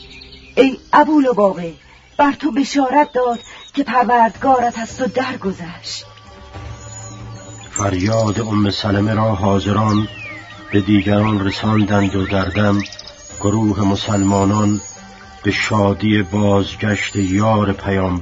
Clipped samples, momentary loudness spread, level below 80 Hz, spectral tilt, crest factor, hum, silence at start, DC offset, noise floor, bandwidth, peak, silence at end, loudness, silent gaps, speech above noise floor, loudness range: under 0.1%; 18 LU; -42 dBFS; -6 dB/octave; 16 dB; none; 0 s; under 0.1%; -38 dBFS; 8 kHz; 0 dBFS; 0 s; -16 LUFS; none; 23 dB; 5 LU